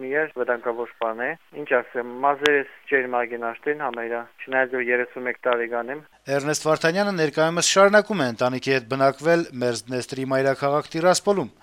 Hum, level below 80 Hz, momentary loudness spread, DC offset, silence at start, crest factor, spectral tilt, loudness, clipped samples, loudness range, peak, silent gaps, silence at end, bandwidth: none; -66 dBFS; 9 LU; under 0.1%; 0 s; 22 dB; -4 dB/octave; -23 LUFS; under 0.1%; 5 LU; -2 dBFS; none; 0.15 s; 16 kHz